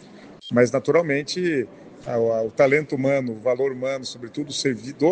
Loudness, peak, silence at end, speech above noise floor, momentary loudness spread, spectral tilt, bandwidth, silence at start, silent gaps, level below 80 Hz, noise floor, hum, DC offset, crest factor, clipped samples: -23 LUFS; -4 dBFS; 0 s; 21 dB; 12 LU; -5 dB/octave; 9.4 kHz; 0 s; none; -64 dBFS; -43 dBFS; none; under 0.1%; 18 dB; under 0.1%